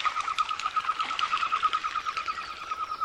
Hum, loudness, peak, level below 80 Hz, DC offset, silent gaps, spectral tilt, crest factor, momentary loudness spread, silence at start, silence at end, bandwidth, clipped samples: none; -29 LUFS; -10 dBFS; -64 dBFS; under 0.1%; none; 0 dB/octave; 20 dB; 7 LU; 0 s; 0 s; 11.5 kHz; under 0.1%